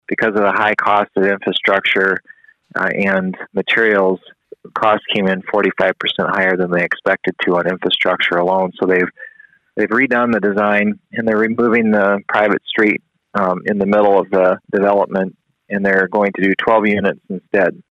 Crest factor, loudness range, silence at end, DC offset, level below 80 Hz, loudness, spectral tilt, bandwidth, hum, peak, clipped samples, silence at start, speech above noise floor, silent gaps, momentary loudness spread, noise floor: 14 dB; 2 LU; 0.15 s; under 0.1%; -58 dBFS; -15 LUFS; -7 dB/octave; 8.2 kHz; none; -2 dBFS; under 0.1%; 0.1 s; 29 dB; none; 7 LU; -44 dBFS